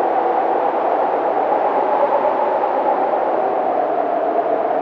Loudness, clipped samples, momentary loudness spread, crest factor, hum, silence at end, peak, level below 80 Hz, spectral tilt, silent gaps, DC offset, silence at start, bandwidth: -18 LUFS; under 0.1%; 2 LU; 14 dB; none; 0 s; -4 dBFS; -66 dBFS; -7 dB/octave; none; under 0.1%; 0 s; 6 kHz